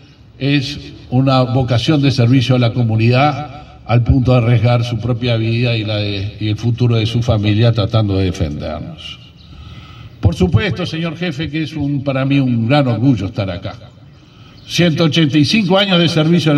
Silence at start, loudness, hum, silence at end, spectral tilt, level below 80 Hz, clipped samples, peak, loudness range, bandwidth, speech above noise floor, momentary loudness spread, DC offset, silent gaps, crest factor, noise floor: 0.4 s; -15 LUFS; none; 0 s; -7 dB/octave; -38 dBFS; under 0.1%; 0 dBFS; 5 LU; 9.6 kHz; 27 dB; 13 LU; under 0.1%; none; 14 dB; -41 dBFS